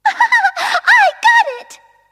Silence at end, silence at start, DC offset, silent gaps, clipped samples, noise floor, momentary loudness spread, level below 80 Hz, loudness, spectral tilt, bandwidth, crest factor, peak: 0.35 s; 0.05 s; under 0.1%; none; under 0.1%; -41 dBFS; 9 LU; -68 dBFS; -11 LUFS; 2 dB/octave; 15 kHz; 14 dB; 0 dBFS